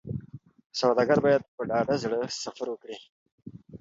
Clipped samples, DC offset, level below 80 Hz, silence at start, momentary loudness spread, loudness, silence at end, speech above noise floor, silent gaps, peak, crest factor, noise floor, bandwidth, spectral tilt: under 0.1%; under 0.1%; -60 dBFS; 0.05 s; 22 LU; -27 LUFS; 0.05 s; 20 dB; 0.66-0.70 s, 1.48-1.58 s, 3.10-3.26 s, 3.32-3.38 s; -8 dBFS; 20 dB; -47 dBFS; 7.8 kHz; -5 dB/octave